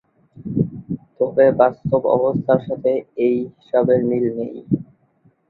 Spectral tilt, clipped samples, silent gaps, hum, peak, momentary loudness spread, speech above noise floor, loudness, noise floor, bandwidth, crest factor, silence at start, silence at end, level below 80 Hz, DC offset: -11.5 dB/octave; under 0.1%; none; none; -2 dBFS; 10 LU; 41 dB; -19 LUFS; -58 dBFS; 4.2 kHz; 18 dB; 0.35 s; 0.65 s; -54 dBFS; under 0.1%